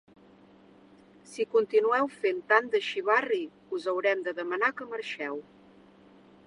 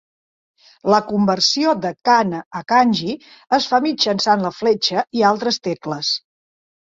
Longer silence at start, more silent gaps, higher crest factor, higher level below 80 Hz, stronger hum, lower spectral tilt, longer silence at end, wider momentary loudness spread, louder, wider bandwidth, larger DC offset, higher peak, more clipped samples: first, 1.3 s vs 0.85 s; second, none vs 2.46-2.51 s; first, 24 dB vs 18 dB; second, -78 dBFS vs -62 dBFS; neither; about the same, -3.5 dB/octave vs -4 dB/octave; first, 1.05 s vs 0.75 s; first, 12 LU vs 8 LU; second, -28 LUFS vs -18 LUFS; first, 11 kHz vs 7.8 kHz; neither; second, -6 dBFS vs -2 dBFS; neither